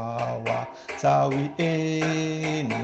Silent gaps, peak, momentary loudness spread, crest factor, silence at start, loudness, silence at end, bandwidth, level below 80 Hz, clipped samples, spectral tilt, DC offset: none; -10 dBFS; 7 LU; 16 dB; 0 s; -26 LUFS; 0 s; 8.4 kHz; -62 dBFS; under 0.1%; -6 dB/octave; under 0.1%